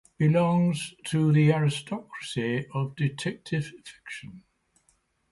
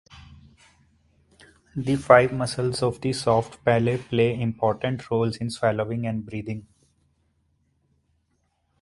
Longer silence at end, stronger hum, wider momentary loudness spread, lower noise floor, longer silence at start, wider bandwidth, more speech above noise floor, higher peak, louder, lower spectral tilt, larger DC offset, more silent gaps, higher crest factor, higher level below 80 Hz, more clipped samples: second, 0.95 s vs 2.2 s; neither; first, 19 LU vs 15 LU; about the same, -69 dBFS vs -71 dBFS; about the same, 0.2 s vs 0.15 s; about the same, 11.5 kHz vs 11.5 kHz; second, 43 dB vs 48 dB; second, -10 dBFS vs 0 dBFS; about the same, -26 LUFS vs -24 LUFS; about the same, -6.5 dB/octave vs -6 dB/octave; neither; neither; second, 18 dB vs 24 dB; second, -62 dBFS vs -54 dBFS; neither